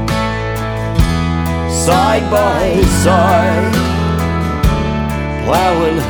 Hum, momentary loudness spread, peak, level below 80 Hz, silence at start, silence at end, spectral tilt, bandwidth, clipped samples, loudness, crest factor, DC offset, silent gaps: none; 7 LU; 0 dBFS; -22 dBFS; 0 s; 0 s; -5.5 dB/octave; over 20 kHz; under 0.1%; -14 LUFS; 12 dB; under 0.1%; none